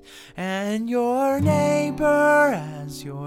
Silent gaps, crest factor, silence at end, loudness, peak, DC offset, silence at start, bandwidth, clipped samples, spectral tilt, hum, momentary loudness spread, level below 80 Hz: none; 14 dB; 0 s; -21 LUFS; -8 dBFS; under 0.1%; 0.1 s; 16.5 kHz; under 0.1%; -6 dB/octave; none; 16 LU; -52 dBFS